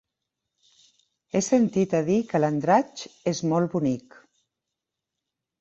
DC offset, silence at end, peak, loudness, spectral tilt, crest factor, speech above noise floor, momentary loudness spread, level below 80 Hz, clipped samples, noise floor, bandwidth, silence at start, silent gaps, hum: under 0.1%; 1.6 s; -8 dBFS; -24 LUFS; -6 dB/octave; 20 dB; 62 dB; 8 LU; -64 dBFS; under 0.1%; -85 dBFS; 8.2 kHz; 1.35 s; none; none